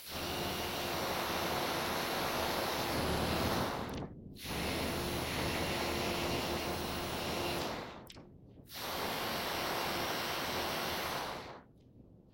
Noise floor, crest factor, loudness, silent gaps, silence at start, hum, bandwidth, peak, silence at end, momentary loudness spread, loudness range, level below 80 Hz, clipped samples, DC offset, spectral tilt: -59 dBFS; 16 dB; -36 LUFS; none; 0 s; none; 16.5 kHz; -22 dBFS; 0 s; 10 LU; 3 LU; -54 dBFS; under 0.1%; under 0.1%; -3.5 dB/octave